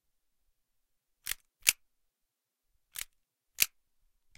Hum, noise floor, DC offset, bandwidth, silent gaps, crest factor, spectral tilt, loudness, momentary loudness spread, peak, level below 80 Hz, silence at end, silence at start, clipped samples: none; -85 dBFS; under 0.1%; 17 kHz; none; 38 dB; 3 dB/octave; -32 LUFS; 16 LU; -2 dBFS; -68 dBFS; 0.7 s; 1.25 s; under 0.1%